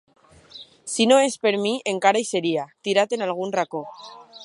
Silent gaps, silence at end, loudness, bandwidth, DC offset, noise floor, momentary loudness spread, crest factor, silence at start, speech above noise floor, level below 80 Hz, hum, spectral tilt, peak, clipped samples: none; 0 s; -22 LUFS; 11.5 kHz; under 0.1%; -46 dBFS; 22 LU; 20 dB; 0.55 s; 24 dB; -72 dBFS; none; -3.5 dB/octave; -2 dBFS; under 0.1%